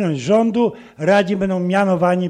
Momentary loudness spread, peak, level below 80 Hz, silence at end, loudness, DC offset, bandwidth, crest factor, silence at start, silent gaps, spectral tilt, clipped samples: 5 LU; -2 dBFS; -52 dBFS; 0 s; -17 LUFS; under 0.1%; 10 kHz; 14 dB; 0 s; none; -7 dB/octave; under 0.1%